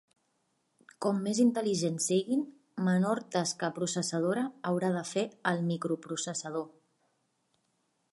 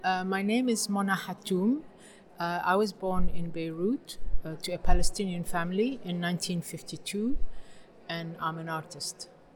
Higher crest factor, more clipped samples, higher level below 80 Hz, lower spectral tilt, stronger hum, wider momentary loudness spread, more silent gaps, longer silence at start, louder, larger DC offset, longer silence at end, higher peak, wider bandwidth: about the same, 20 dB vs 20 dB; neither; second, -80 dBFS vs -36 dBFS; about the same, -5 dB/octave vs -4.5 dB/octave; neither; second, 8 LU vs 11 LU; neither; first, 1 s vs 0 s; about the same, -31 LUFS vs -31 LUFS; neither; first, 1.45 s vs 0.3 s; second, -12 dBFS vs -8 dBFS; second, 11.5 kHz vs 17.5 kHz